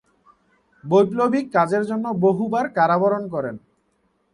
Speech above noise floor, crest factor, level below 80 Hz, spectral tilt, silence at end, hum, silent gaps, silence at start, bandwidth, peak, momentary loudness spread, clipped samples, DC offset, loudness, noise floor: 47 dB; 18 dB; -64 dBFS; -7.5 dB/octave; 0.75 s; none; none; 0.85 s; 11 kHz; -4 dBFS; 10 LU; under 0.1%; under 0.1%; -20 LUFS; -67 dBFS